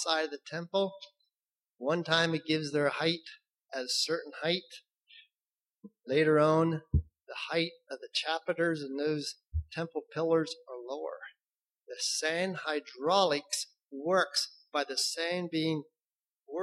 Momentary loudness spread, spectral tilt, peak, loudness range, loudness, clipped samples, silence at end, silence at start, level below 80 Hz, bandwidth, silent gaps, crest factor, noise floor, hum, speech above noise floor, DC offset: 14 LU; -4 dB/octave; -10 dBFS; 4 LU; -32 LUFS; under 0.1%; 0 s; 0 s; -50 dBFS; 13 kHz; 3.50-3.54 s, 5.51-5.56 s, 11.64-11.68 s, 16.38-16.42 s; 22 dB; under -90 dBFS; none; over 59 dB; under 0.1%